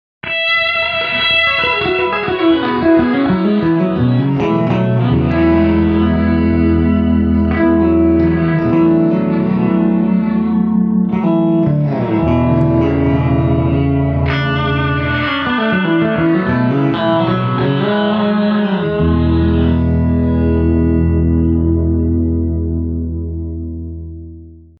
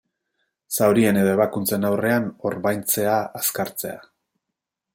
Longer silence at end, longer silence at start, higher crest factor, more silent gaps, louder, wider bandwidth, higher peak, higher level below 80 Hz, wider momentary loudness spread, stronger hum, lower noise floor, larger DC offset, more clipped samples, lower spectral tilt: second, 0.2 s vs 0.95 s; second, 0.25 s vs 0.7 s; second, 12 dB vs 18 dB; neither; first, -14 LUFS vs -21 LUFS; second, 5.6 kHz vs 17 kHz; about the same, -2 dBFS vs -4 dBFS; first, -26 dBFS vs -62 dBFS; second, 4 LU vs 11 LU; neither; second, -35 dBFS vs -83 dBFS; neither; neither; first, -9.5 dB/octave vs -5 dB/octave